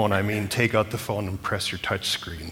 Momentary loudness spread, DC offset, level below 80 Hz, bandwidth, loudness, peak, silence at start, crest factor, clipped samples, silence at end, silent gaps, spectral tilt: 6 LU; under 0.1%; -50 dBFS; 19 kHz; -26 LUFS; -6 dBFS; 0 s; 20 dB; under 0.1%; 0 s; none; -4.5 dB/octave